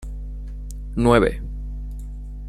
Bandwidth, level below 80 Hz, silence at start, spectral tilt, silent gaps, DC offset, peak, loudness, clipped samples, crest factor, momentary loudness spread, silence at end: 12.5 kHz; -30 dBFS; 0 s; -7 dB/octave; none; under 0.1%; -2 dBFS; -21 LUFS; under 0.1%; 20 dB; 19 LU; 0 s